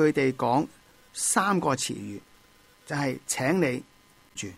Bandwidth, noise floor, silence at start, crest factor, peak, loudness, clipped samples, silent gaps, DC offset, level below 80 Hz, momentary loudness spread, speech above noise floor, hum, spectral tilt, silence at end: 16 kHz; -58 dBFS; 0 s; 20 dB; -8 dBFS; -27 LUFS; under 0.1%; none; under 0.1%; -64 dBFS; 16 LU; 32 dB; none; -4 dB/octave; 0 s